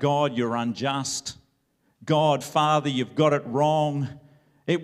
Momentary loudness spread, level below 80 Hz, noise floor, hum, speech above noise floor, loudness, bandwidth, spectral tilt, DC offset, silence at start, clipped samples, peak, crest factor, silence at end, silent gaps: 10 LU; -68 dBFS; -69 dBFS; none; 46 dB; -24 LUFS; 15 kHz; -5 dB/octave; under 0.1%; 0 s; under 0.1%; -6 dBFS; 18 dB; 0 s; none